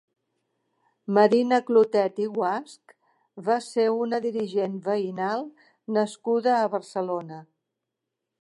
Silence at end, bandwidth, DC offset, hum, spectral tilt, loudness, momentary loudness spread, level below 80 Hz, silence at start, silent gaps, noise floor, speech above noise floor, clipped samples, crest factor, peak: 0.95 s; 11.5 kHz; under 0.1%; none; -6 dB/octave; -25 LUFS; 13 LU; -82 dBFS; 1.1 s; none; -84 dBFS; 60 dB; under 0.1%; 20 dB; -6 dBFS